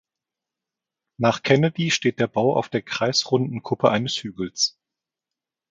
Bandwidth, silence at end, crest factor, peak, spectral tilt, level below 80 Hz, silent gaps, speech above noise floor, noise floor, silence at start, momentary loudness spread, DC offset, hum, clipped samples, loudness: 9.4 kHz; 1 s; 20 dB; -4 dBFS; -4.5 dB/octave; -62 dBFS; none; 66 dB; -88 dBFS; 1.2 s; 8 LU; under 0.1%; none; under 0.1%; -22 LUFS